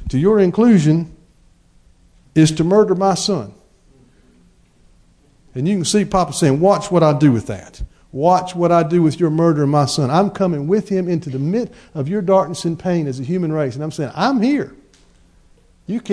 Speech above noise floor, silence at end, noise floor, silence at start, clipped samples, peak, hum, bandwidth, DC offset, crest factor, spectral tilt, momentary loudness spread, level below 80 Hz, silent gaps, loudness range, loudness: 37 dB; 0 s; -52 dBFS; 0 s; under 0.1%; -2 dBFS; none; 11 kHz; under 0.1%; 14 dB; -6.5 dB/octave; 13 LU; -44 dBFS; none; 5 LU; -16 LUFS